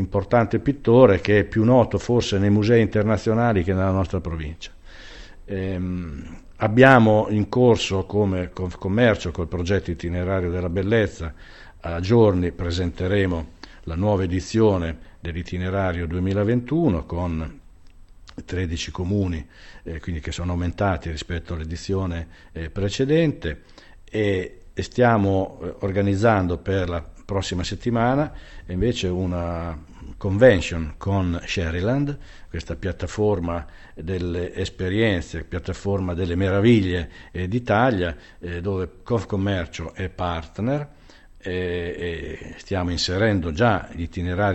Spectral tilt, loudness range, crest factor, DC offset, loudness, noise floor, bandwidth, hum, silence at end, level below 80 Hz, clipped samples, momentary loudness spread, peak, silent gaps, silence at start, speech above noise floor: -7 dB/octave; 8 LU; 22 dB; under 0.1%; -22 LUFS; -45 dBFS; 8.4 kHz; none; 0 s; -38 dBFS; under 0.1%; 15 LU; 0 dBFS; none; 0 s; 24 dB